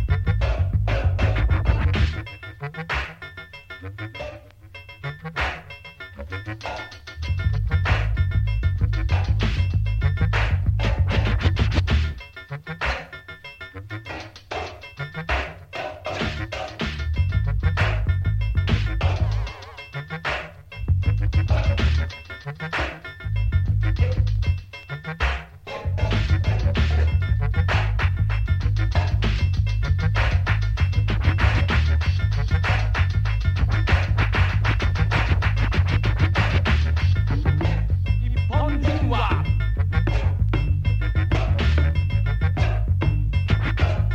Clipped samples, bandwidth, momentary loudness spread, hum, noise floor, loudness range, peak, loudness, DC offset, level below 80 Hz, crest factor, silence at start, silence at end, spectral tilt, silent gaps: under 0.1%; 7.2 kHz; 14 LU; none; -43 dBFS; 9 LU; -6 dBFS; -23 LUFS; under 0.1%; -26 dBFS; 16 dB; 0 s; 0 s; -7 dB/octave; none